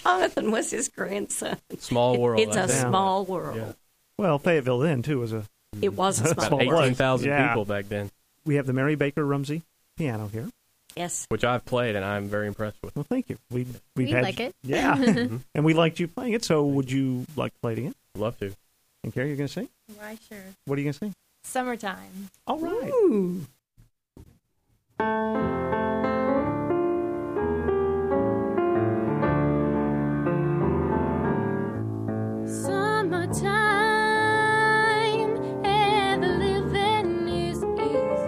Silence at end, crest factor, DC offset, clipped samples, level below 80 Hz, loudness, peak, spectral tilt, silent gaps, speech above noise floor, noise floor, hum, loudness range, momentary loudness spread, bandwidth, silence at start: 0 s; 20 dB; under 0.1%; under 0.1%; -50 dBFS; -25 LUFS; -6 dBFS; -5.5 dB/octave; none; 44 dB; -70 dBFS; none; 7 LU; 14 LU; 15.5 kHz; 0 s